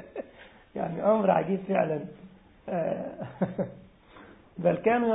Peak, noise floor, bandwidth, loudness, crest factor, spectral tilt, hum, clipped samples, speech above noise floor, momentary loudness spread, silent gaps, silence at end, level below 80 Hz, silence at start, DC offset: -10 dBFS; -53 dBFS; 4 kHz; -28 LUFS; 20 dB; -11.5 dB/octave; none; under 0.1%; 26 dB; 18 LU; none; 0 s; -64 dBFS; 0 s; under 0.1%